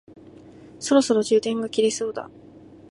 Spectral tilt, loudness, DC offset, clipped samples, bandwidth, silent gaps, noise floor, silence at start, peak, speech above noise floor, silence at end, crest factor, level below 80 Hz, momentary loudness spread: -4 dB/octave; -22 LUFS; under 0.1%; under 0.1%; 11.5 kHz; none; -46 dBFS; 0.65 s; -6 dBFS; 24 dB; 0.65 s; 18 dB; -64 dBFS; 15 LU